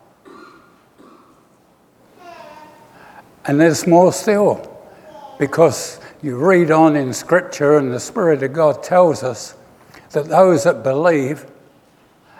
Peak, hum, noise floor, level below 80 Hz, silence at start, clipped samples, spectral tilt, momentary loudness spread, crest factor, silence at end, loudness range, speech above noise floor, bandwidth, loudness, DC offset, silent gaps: 0 dBFS; none; -53 dBFS; -62 dBFS; 2.25 s; under 0.1%; -6 dB/octave; 14 LU; 18 dB; 0.95 s; 3 LU; 39 dB; 16 kHz; -15 LUFS; under 0.1%; none